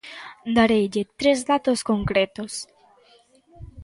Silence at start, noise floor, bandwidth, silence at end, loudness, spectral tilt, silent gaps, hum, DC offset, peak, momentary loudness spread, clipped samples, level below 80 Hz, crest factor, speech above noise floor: 0.05 s; -57 dBFS; 11.5 kHz; 0 s; -22 LUFS; -4.5 dB/octave; none; none; under 0.1%; -6 dBFS; 16 LU; under 0.1%; -48 dBFS; 18 dB; 35 dB